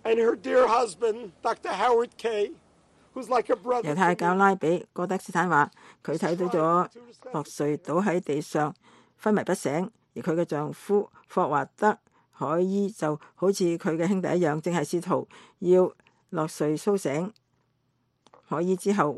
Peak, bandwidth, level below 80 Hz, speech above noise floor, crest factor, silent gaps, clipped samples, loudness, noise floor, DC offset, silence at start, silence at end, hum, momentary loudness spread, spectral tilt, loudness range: -6 dBFS; 12.5 kHz; -72 dBFS; 47 dB; 20 dB; none; under 0.1%; -26 LUFS; -72 dBFS; under 0.1%; 0.05 s; 0 s; none; 9 LU; -6 dB/octave; 3 LU